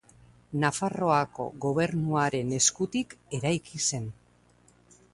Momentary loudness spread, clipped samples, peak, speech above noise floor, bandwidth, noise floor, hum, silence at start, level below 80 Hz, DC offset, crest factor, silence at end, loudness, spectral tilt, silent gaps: 10 LU; under 0.1%; -10 dBFS; 33 dB; 11.5 kHz; -61 dBFS; 60 Hz at -50 dBFS; 0.5 s; -62 dBFS; under 0.1%; 20 dB; 1 s; -28 LUFS; -4 dB/octave; none